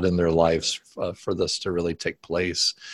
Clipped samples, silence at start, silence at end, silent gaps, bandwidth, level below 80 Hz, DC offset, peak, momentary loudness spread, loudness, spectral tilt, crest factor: under 0.1%; 0 s; 0 s; none; 12.5 kHz; -44 dBFS; under 0.1%; -6 dBFS; 10 LU; -25 LUFS; -4 dB/octave; 18 dB